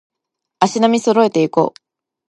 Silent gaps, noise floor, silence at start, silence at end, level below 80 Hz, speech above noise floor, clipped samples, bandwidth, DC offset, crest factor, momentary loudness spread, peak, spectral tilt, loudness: none; -80 dBFS; 0.6 s; 0.6 s; -64 dBFS; 65 dB; under 0.1%; 11 kHz; under 0.1%; 16 dB; 5 LU; 0 dBFS; -5 dB/octave; -15 LUFS